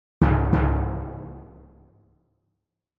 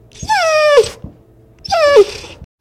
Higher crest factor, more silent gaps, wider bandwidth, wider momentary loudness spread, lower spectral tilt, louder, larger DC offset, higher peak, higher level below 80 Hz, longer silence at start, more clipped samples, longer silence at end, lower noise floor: first, 20 dB vs 14 dB; neither; second, 4.3 kHz vs 14.5 kHz; first, 20 LU vs 14 LU; first, -10.5 dB/octave vs -3 dB/octave; second, -23 LUFS vs -12 LUFS; neither; second, -6 dBFS vs 0 dBFS; first, -30 dBFS vs -42 dBFS; about the same, 0.2 s vs 0.2 s; second, under 0.1% vs 0.4%; first, 1.55 s vs 0.15 s; first, -80 dBFS vs -45 dBFS